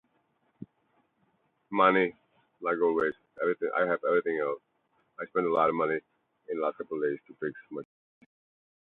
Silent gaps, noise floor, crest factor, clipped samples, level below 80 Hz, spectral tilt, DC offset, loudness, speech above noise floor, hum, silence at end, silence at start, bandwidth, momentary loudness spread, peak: none; -73 dBFS; 24 dB; under 0.1%; -76 dBFS; -8.5 dB/octave; under 0.1%; -29 LUFS; 44 dB; none; 1 s; 0.6 s; 4.2 kHz; 13 LU; -8 dBFS